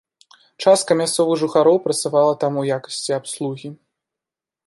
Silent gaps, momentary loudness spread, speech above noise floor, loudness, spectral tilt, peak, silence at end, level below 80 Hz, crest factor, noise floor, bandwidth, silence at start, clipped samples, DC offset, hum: none; 11 LU; 70 dB; -18 LUFS; -4.5 dB/octave; -2 dBFS; 0.9 s; -72 dBFS; 18 dB; -88 dBFS; 12 kHz; 0.6 s; under 0.1%; under 0.1%; none